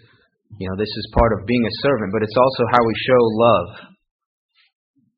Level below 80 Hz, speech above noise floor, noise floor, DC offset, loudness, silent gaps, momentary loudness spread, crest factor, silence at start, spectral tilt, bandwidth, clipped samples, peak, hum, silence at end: -36 dBFS; 39 dB; -57 dBFS; under 0.1%; -18 LUFS; none; 10 LU; 20 dB; 0.5 s; -4.5 dB/octave; 5.4 kHz; under 0.1%; 0 dBFS; none; 1.3 s